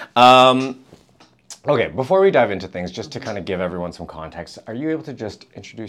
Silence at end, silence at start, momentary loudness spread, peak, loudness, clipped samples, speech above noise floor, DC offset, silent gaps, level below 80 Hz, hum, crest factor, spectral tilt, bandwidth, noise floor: 0 s; 0 s; 22 LU; 0 dBFS; -17 LUFS; under 0.1%; 35 dB; under 0.1%; none; -54 dBFS; none; 18 dB; -5 dB/octave; 15.5 kHz; -53 dBFS